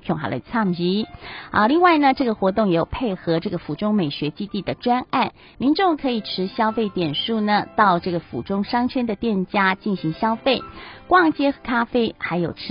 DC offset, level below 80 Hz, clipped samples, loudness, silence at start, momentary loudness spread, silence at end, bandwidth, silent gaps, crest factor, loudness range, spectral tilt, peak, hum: under 0.1%; -48 dBFS; under 0.1%; -21 LUFS; 0.05 s; 9 LU; 0 s; 5.4 kHz; none; 18 dB; 3 LU; -10.5 dB/octave; -2 dBFS; none